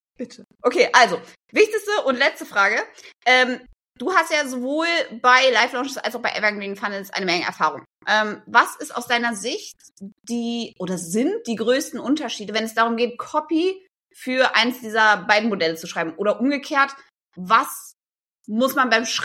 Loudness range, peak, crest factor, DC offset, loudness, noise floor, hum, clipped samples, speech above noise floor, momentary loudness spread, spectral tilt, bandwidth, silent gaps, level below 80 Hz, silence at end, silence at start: 5 LU; -2 dBFS; 20 dB; under 0.1%; -20 LUFS; -70 dBFS; none; under 0.1%; 49 dB; 13 LU; -3 dB/octave; 16.5 kHz; 18.26-18.39 s; -70 dBFS; 0 s; 0.2 s